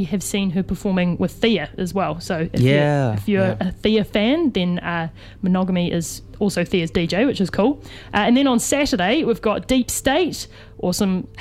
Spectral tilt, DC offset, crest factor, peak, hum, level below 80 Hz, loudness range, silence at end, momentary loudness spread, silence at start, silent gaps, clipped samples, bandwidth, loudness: -5 dB/octave; under 0.1%; 16 dB; -4 dBFS; none; -42 dBFS; 2 LU; 0 s; 7 LU; 0 s; none; under 0.1%; 16 kHz; -20 LUFS